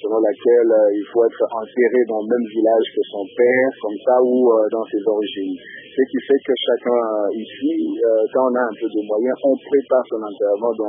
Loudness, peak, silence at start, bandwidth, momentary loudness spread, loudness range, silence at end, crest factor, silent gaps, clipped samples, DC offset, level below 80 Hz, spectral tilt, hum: -18 LUFS; -4 dBFS; 0 s; 3.7 kHz; 8 LU; 3 LU; 0 s; 14 dB; none; under 0.1%; under 0.1%; -72 dBFS; -10 dB/octave; none